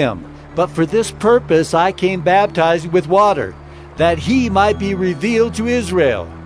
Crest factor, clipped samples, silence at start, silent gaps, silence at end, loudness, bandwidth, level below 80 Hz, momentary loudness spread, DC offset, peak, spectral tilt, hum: 16 dB; under 0.1%; 0 s; none; 0 s; -15 LUFS; 11 kHz; -38 dBFS; 7 LU; under 0.1%; 0 dBFS; -5.5 dB/octave; none